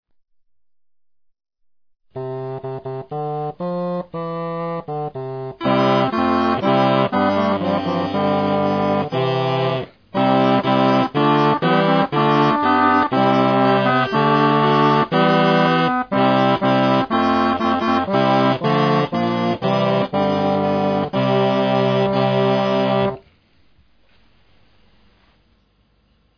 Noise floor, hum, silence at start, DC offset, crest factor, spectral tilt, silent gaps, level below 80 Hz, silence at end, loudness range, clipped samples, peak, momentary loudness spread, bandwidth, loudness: -60 dBFS; none; 2.15 s; under 0.1%; 16 dB; -7.5 dB/octave; none; -56 dBFS; 3.2 s; 11 LU; under 0.1%; -2 dBFS; 11 LU; 5.4 kHz; -18 LUFS